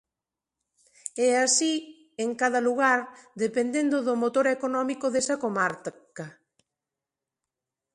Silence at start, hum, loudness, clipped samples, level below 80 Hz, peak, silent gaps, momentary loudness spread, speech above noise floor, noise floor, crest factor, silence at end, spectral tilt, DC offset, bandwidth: 1.05 s; none; -25 LUFS; under 0.1%; -76 dBFS; -10 dBFS; none; 19 LU; 63 dB; -89 dBFS; 18 dB; 1.65 s; -2.5 dB/octave; under 0.1%; 11.5 kHz